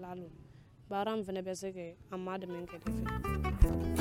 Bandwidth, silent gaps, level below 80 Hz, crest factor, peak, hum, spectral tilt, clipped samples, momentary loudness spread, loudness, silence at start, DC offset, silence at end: 16.5 kHz; none; -38 dBFS; 24 dB; -12 dBFS; none; -6.5 dB/octave; under 0.1%; 15 LU; -37 LUFS; 0 s; under 0.1%; 0 s